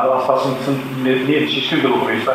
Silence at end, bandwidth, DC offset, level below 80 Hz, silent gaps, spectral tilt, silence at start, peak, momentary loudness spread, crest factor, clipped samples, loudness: 0 s; 16 kHz; under 0.1%; -66 dBFS; none; -6 dB/octave; 0 s; 0 dBFS; 4 LU; 16 dB; under 0.1%; -17 LUFS